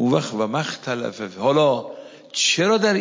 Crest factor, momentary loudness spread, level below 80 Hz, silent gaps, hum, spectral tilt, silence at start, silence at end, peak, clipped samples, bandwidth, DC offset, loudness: 16 dB; 12 LU; -68 dBFS; none; none; -4 dB/octave; 0 s; 0 s; -6 dBFS; under 0.1%; 7.8 kHz; under 0.1%; -21 LUFS